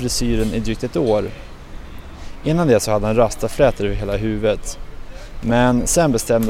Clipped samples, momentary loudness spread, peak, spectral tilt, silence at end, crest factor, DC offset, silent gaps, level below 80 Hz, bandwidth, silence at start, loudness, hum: under 0.1%; 22 LU; -2 dBFS; -5 dB/octave; 0 s; 16 dB; under 0.1%; none; -30 dBFS; 16 kHz; 0 s; -18 LUFS; none